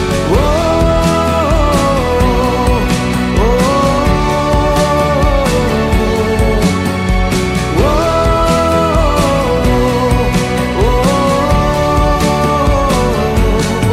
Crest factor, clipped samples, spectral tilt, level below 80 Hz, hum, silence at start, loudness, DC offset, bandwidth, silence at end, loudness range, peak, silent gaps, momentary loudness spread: 10 dB; under 0.1%; -6 dB/octave; -18 dBFS; none; 0 s; -12 LUFS; under 0.1%; 15.5 kHz; 0 s; 1 LU; 0 dBFS; none; 2 LU